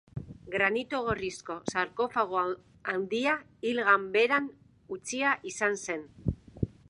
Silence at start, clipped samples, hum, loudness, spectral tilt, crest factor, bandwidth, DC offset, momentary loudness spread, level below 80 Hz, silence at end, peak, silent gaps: 0.15 s; under 0.1%; none; -30 LUFS; -4.5 dB/octave; 20 dB; 11 kHz; under 0.1%; 12 LU; -52 dBFS; 0.2 s; -10 dBFS; none